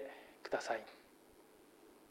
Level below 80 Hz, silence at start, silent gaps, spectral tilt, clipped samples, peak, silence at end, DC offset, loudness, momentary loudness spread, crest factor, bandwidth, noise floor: -80 dBFS; 0 s; none; -2.5 dB/octave; under 0.1%; -24 dBFS; 0 s; under 0.1%; -43 LUFS; 24 LU; 24 dB; 16 kHz; -64 dBFS